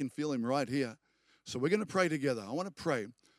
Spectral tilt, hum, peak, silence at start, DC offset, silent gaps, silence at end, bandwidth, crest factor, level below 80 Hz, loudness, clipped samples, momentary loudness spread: -5.5 dB/octave; none; -16 dBFS; 0 s; under 0.1%; none; 0.3 s; 14 kHz; 18 dB; -76 dBFS; -34 LUFS; under 0.1%; 8 LU